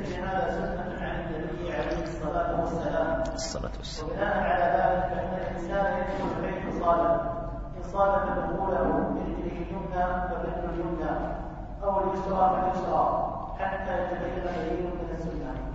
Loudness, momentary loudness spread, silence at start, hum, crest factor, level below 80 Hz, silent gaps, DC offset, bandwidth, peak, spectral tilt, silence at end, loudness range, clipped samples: -29 LUFS; 9 LU; 0 s; none; 18 dB; -40 dBFS; none; under 0.1%; 8 kHz; -12 dBFS; -6.5 dB/octave; 0 s; 3 LU; under 0.1%